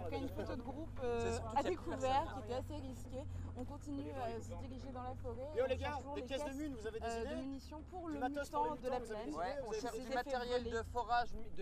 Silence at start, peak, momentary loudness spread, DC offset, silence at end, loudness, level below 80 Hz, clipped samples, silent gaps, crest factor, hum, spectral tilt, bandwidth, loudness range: 0 s; -24 dBFS; 9 LU; under 0.1%; 0 s; -42 LUFS; -54 dBFS; under 0.1%; none; 18 dB; none; -5.5 dB/octave; 15.5 kHz; 3 LU